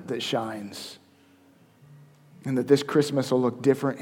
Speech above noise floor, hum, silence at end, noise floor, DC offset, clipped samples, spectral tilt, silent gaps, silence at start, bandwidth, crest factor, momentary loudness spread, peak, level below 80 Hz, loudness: 33 dB; none; 0 s; -57 dBFS; under 0.1%; under 0.1%; -6 dB/octave; none; 0 s; 16.5 kHz; 22 dB; 17 LU; -6 dBFS; -74 dBFS; -25 LUFS